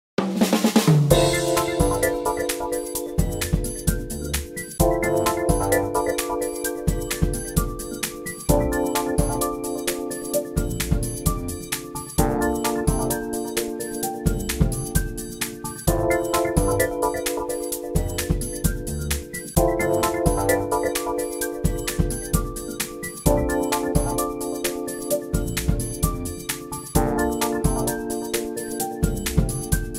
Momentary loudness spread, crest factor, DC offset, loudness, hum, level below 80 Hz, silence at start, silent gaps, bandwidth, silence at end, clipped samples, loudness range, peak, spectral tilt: 7 LU; 22 dB; under 0.1%; -24 LUFS; none; -32 dBFS; 0.2 s; none; 16.5 kHz; 0 s; under 0.1%; 2 LU; -2 dBFS; -5 dB/octave